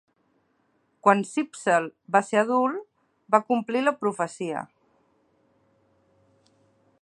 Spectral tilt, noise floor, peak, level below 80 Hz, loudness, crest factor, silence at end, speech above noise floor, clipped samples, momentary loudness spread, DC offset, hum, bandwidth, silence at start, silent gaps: -5 dB/octave; -69 dBFS; -2 dBFS; -82 dBFS; -25 LUFS; 24 dB; 2.35 s; 45 dB; under 0.1%; 10 LU; under 0.1%; none; 11.5 kHz; 1.05 s; none